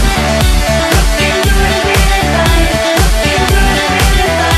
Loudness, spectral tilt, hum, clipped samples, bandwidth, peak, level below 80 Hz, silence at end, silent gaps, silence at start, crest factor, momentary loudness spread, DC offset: -10 LUFS; -4 dB/octave; none; under 0.1%; 14.5 kHz; 0 dBFS; -14 dBFS; 0 s; none; 0 s; 10 dB; 1 LU; under 0.1%